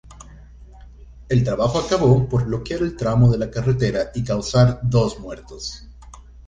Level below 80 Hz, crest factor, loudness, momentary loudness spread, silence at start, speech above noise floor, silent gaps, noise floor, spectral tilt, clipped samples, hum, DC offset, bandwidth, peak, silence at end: -38 dBFS; 18 dB; -19 LUFS; 15 LU; 0.1 s; 23 dB; none; -42 dBFS; -7 dB/octave; under 0.1%; none; under 0.1%; 7.8 kHz; -2 dBFS; 0.05 s